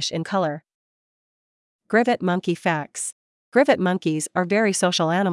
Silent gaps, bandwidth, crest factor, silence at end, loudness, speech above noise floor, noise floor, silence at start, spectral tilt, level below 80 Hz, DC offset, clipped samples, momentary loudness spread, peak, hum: 0.74-1.79 s, 3.12-3.52 s; 12 kHz; 18 dB; 0 s; -22 LUFS; over 69 dB; under -90 dBFS; 0 s; -4.5 dB/octave; -74 dBFS; under 0.1%; under 0.1%; 9 LU; -4 dBFS; none